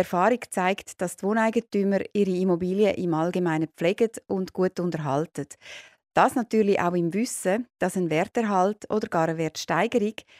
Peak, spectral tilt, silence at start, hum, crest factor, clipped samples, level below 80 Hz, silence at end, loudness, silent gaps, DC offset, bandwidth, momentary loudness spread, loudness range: -6 dBFS; -6 dB/octave; 0 s; none; 18 dB; under 0.1%; -66 dBFS; 0.2 s; -25 LUFS; none; under 0.1%; 15.5 kHz; 7 LU; 2 LU